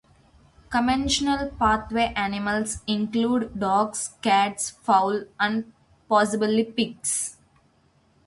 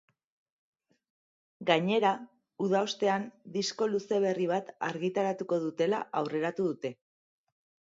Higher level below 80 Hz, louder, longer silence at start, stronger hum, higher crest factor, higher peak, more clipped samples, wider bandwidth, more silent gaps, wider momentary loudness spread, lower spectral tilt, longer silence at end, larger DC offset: first, -48 dBFS vs -82 dBFS; first, -24 LUFS vs -31 LUFS; second, 0.7 s vs 1.6 s; neither; about the same, 18 dB vs 22 dB; about the same, -8 dBFS vs -10 dBFS; neither; first, 11.5 kHz vs 7.8 kHz; neither; about the same, 6 LU vs 8 LU; second, -3.5 dB/octave vs -5 dB/octave; about the same, 0.95 s vs 0.9 s; neither